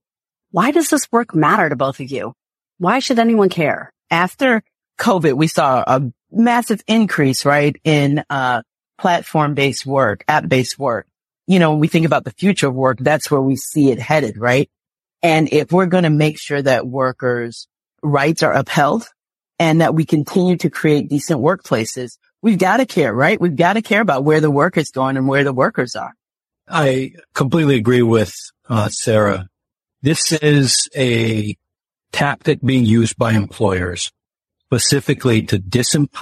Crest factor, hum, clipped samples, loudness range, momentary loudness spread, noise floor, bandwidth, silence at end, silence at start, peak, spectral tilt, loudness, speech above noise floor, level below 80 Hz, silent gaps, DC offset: 16 dB; none; under 0.1%; 2 LU; 8 LU; -87 dBFS; 13.5 kHz; 0 s; 0.55 s; 0 dBFS; -5 dB/octave; -16 LUFS; 72 dB; -54 dBFS; none; under 0.1%